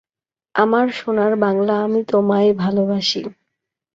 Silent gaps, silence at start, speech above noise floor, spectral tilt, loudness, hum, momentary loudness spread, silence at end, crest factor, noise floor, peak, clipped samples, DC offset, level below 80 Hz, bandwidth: none; 0.55 s; over 73 dB; -6 dB/octave; -18 LUFS; none; 5 LU; 0.65 s; 16 dB; under -90 dBFS; -2 dBFS; under 0.1%; under 0.1%; -62 dBFS; 7.8 kHz